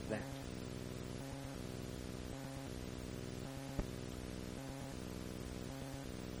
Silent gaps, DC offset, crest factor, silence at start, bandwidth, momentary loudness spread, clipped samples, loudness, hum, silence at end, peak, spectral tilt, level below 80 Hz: none; under 0.1%; 20 dB; 0 s; over 20 kHz; 2 LU; under 0.1%; -47 LUFS; none; 0 s; -24 dBFS; -5.5 dB/octave; -54 dBFS